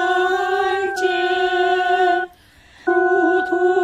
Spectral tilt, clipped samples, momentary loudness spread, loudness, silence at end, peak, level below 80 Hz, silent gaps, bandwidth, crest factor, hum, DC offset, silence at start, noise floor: -3 dB/octave; under 0.1%; 4 LU; -18 LUFS; 0 s; -6 dBFS; -58 dBFS; none; 10.5 kHz; 12 dB; none; under 0.1%; 0 s; -49 dBFS